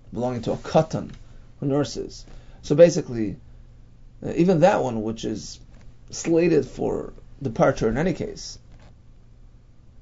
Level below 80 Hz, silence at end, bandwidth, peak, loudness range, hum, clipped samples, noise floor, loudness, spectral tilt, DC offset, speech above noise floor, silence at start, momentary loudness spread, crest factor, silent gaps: -44 dBFS; 0.1 s; 7.8 kHz; -2 dBFS; 3 LU; none; under 0.1%; -49 dBFS; -23 LUFS; -6.5 dB/octave; under 0.1%; 26 dB; 0.05 s; 21 LU; 22 dB; none